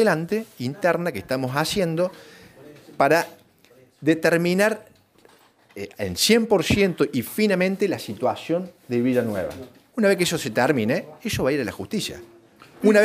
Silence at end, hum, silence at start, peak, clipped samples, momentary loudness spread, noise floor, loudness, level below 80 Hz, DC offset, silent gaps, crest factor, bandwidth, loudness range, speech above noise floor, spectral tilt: 0 s; none; 0 s; -6 dBFS; under 0.1%; 12 LU; -56 dBFS; -22 LUFS; -52 dBFS; under 0.1%; none; 18 dB; 16 kHz; 3 LU; 33 dB; -5 dB/octave